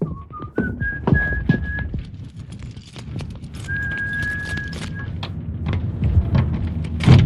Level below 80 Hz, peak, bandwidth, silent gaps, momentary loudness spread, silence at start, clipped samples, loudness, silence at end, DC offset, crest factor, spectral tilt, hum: -30 dBFS; -2 dBFS; 11 kHz; none; 16 LU; 0 s; under 0.1%; -23 LUFS; 0 s; under 0.1%; 20 dB; -7.5 dB/octave; none